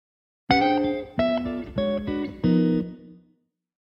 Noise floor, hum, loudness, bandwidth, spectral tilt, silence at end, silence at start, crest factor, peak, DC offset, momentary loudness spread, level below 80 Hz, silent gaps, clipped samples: -67 dBFS; none; -24 LUFS; 7 kHz; -8 dB/octave; 0.7 s; 0.5 s; 20 dB; -6 dBFS; under 0.1%; 8 LU; -48 dBFS; none; under 0.1%